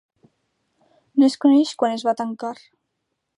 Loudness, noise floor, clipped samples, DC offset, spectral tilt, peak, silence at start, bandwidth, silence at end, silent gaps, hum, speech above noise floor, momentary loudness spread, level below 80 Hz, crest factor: -20 LUFS; -77 dBFS; under 0.1%; under 0.1%; -4.5 dB/octave; -6 dBFS; 1.15 s; 11 kHz; 0.85 s; none; none; 58 dB; 15 LU; -78 dBFS; 16 dB